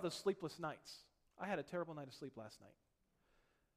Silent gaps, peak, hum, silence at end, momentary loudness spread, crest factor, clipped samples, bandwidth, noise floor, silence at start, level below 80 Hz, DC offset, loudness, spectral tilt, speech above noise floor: none; -28 dBFS; none; 1.05 s; 16 LU; 20 dB; under 0.1%; 15 kHz; -79 dBFS; 0 s; -80 dBFS; under 0.1%; -47 LUFS; -5 dB/octave; 33 dB